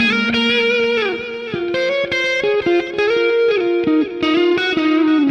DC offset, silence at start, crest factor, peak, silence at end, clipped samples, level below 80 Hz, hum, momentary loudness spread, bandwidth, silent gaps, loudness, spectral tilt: under 0.1%; 0 s; 10 dB; -6 dBFS; 0 s; under 0.1%; -54 dBFS; none; 5 LU; 8.6 kHz; none; -16 LUFS; -4.5 dB/octave